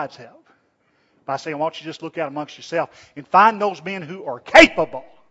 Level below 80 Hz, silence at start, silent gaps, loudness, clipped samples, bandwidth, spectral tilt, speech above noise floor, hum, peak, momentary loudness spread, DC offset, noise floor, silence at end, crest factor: -50 dBFS; 0 s; none; -18 LUFS; under 0.1%; 11 kHz; -4 dB/octave; 45 dB; none; 0 dBFS; 21 LU; under 0.1%; -64 dBFS; 0.3 s; 20 dB